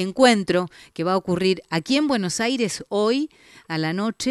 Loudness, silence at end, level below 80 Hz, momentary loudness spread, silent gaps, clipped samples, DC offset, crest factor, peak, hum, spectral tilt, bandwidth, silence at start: -22 LUFS; 0 s; -60 dBFS; 10 LU; none; under 0.1%; under 0.1%; 18 dB; -4 dBFS; none; -4.5 dB/octave; 13 kHz; 0 s